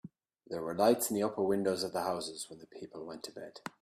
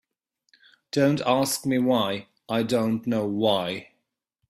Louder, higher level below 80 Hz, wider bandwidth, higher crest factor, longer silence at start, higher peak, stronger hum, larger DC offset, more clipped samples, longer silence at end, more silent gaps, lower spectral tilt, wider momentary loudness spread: second, -33 LUFS vs -24 LUFS; second, -74 dBFS vs -66 dBFS; about the same, 15.5 kHz vs 16 kHz; about the same, 22 dB vs 18 dB; second, 0.05 s vs 0.95 s; second, -14 dBFS vs -8 dBFS; neither; neither; neither; second, 0.15 s vs 0.65 s; neither; about the same, -4 dB/octave vs -5 dB/octave; first, 17 LU vs 8 LU